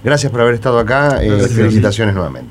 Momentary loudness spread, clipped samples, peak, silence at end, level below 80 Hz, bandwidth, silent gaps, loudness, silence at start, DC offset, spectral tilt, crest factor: 4 LU; under 0.1%; 0 dBFS; 0 s; -30 dBFS; 12 kHz; none; -13 LUFS; 0 s; under 0.1%; -6 dB/octave; 12 dB